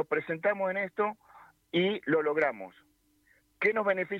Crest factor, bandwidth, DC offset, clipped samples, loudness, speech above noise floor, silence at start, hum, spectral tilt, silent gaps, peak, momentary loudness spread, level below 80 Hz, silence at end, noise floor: 18 dB; 7.2 kHz; under 0.1%; under 0.1%; -30 LUFS; 38 dB; 0 s; none; -7 dB/octave; none; -14 dBFS; 7 LU; -76 dBFS; 0 s; -68 dBFS